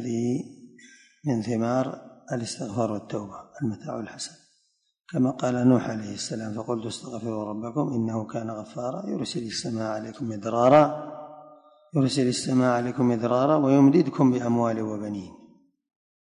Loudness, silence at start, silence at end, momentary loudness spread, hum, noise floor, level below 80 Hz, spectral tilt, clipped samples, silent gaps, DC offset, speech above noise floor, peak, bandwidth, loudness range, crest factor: -26 LUFS; 0 s; 1.05 s; 15 LU; none; -70 dBFS; -64 dBFS; -6.5 dB/octave; under 0.1%; none; under 0.1%; 45 dB; -6 dBFS; 11 kHz; 8 LU; 20 dB